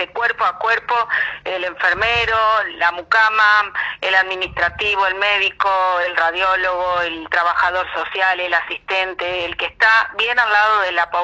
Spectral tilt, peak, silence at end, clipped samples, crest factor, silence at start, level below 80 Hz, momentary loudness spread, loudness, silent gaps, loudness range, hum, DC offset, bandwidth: -3 dB/octave; -2 dBFS; 0 s; under 0.1%; 16 dB; 0 s; -48 dBFS; 8 LU; -17 LUFS; none; 2 LU; none; under 0.1%; 9.2 kHz